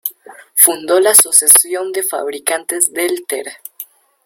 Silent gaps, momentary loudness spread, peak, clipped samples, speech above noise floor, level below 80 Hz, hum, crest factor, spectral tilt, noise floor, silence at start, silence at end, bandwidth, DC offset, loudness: none; 18 LU; 0 dBFS; 0.6%; 23 dB; -64 dBFS; none; 14 dB; 0.5 dB/octave; -37 dBFS; 0.05 s; 0.4 s; over 20 kHz; under 0.1%; -11 LUFS